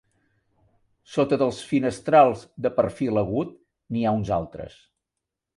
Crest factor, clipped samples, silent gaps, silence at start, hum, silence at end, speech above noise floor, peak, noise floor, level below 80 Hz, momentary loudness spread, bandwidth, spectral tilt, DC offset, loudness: 20 dB; under 0.1%; none; 1.1 s; none; 0.9 s; 62 dB; -4 dBFS; -85 dBFS; -54 dBFS; 15 LU; 11.5 kHz; -7 dB/octave; under 0.1%; -23 LUFS